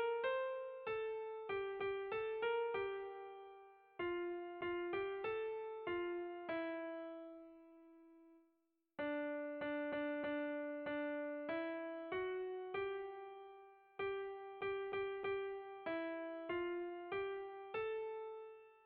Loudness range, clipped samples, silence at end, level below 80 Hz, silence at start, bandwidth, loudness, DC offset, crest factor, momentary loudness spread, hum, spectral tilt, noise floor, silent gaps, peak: 4 LU; under 0.1%; 0.05 s; -78 dBFS; 0 s; 4.8 kHz; -44 LUFS; under 0.1%; 14 dB; 13 LU; none; -2.5 dB/octave; -83 dBFS; none; -30 dBFS